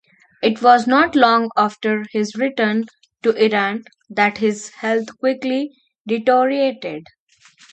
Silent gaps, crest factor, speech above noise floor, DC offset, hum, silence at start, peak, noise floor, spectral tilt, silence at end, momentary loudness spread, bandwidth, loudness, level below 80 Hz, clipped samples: 6.00-6.05 s; 18 dB; 34 dB; under 0.1%; none; 0.4 s; 0 dBFS; -51 dBFS; -5 dB/octave; 0.7 s; 15 LU; 8.8 kHz; -18 LUFS; -64 dBFS; under 0.1%